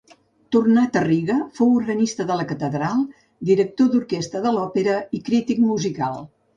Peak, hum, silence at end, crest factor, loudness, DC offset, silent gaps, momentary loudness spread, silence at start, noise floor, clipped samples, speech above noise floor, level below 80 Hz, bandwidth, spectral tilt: -6 dBFS; none; 0.3 s; 14 dB; -21 LUFS; under 0.1%; none; 8 LU; 0.5 s; -49 dBFS; under 0.1%; 29 dB; -60 dBFS; 7.6 kHz; -6.5 dB/octave